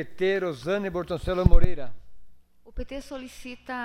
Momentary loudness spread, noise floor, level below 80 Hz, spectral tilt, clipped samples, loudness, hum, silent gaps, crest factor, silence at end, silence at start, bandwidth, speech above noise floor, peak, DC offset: 18 LU; -44 dBFS; -28 dBFS; -7 dB/octave; under 0.1%; -28 LUFS; none; none; 18 dB; 0 s; 0 s; 6.4 kHz; 22 dB; -4 dBFS; under 0.1%